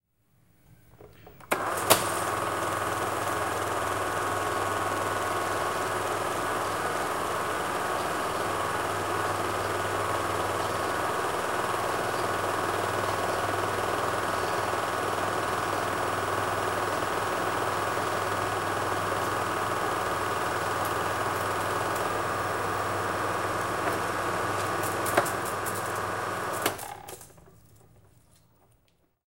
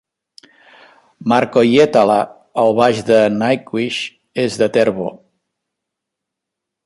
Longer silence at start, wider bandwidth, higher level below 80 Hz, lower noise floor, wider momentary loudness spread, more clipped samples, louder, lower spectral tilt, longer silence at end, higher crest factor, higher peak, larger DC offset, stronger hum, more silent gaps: second, 0.7 s vs 1.2 s; first, 16 kHz vs 11.5 kHz; about the same, -56 dBFS vs -58 dBFS; second, -69 dBFS vs -81 dBFS; second, 1 LU vs 12 LU; neither; second, -29 LUFS vs -15 LUFS; second, -3.5 dB/octave vs -5.5 dB/octave; second, 1.4 s vs 1.7 s; first, 28 dB vs 16 dB; about the same, -2 dBFS vs 0 dBFS; first, 0.2% vs under 0.1%; neither; neither